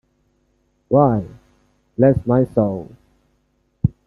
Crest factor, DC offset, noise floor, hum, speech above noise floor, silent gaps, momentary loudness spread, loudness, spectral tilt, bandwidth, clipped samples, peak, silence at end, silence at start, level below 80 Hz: 20 dB; under 0.1%; -64 dBFS; none; 49 dB; none; 18 LU; -18 LUFS; -12 dB/octave; 2.8 kHz; under 0.1%; -2 dBFS; 0.15 s; 0.9 s; -44 dBFS